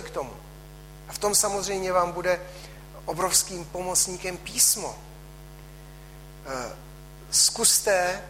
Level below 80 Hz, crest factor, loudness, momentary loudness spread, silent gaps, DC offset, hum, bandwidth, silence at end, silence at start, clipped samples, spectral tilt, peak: -48 dBFS; 22 dB; -23 LUFS; 22 LU; none; under 0.1%; none; 16 kHz; 0 s; 0 s; under 0.1%; -1 dB/octave; -6 dBFS